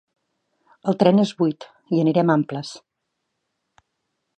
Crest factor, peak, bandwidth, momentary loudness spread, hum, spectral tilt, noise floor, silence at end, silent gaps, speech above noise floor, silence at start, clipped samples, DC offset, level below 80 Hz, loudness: 22 dB; -2 dBFS; 9.2 kHz; 15 LU; none; -7.5 dB/octave; -78 dBFS; 1.6 s; none; 58 dB; 0.85 s; under 0.1%; under 0.1%; -72 dBFS; -20 LUFS